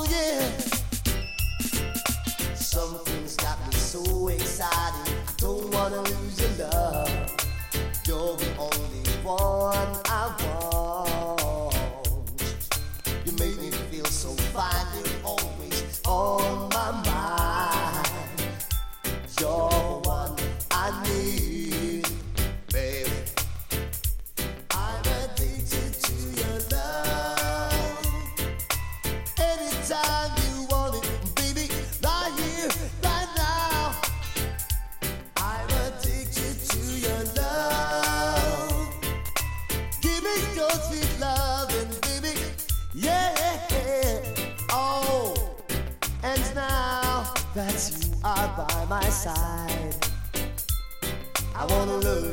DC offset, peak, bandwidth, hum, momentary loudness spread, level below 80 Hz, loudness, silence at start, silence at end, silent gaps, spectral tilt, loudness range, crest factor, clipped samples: under 0.1%; -10 dBFS; 17 kHz; none; 5 LU; -32 dBFS; -27 LUFS; 0 s; 0 s; none; -3.5 dB/octave; 2 LU; 18 dB; under 0.1%